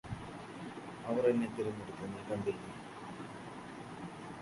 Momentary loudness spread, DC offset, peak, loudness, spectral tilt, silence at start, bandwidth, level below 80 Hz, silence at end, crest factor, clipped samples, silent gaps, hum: 15 LU; under 0.1%; -18 dBFS; -40 LUFS; -6.5 dB/octave; 0.05 s; 11.5 kHz; -64 dBFS; 0 s; 20 dB; under 0.1%; none; none